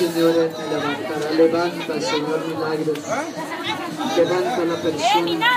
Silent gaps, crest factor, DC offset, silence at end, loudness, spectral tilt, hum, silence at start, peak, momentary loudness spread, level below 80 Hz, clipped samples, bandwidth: none; 16 dB; under 0.1%; 0 s; -21 LUFS; -4.5 dB/octave; none; 0 s; -4 dBFS; 8 LU; -68 dBFS; under 0.1%; 15.5 kHz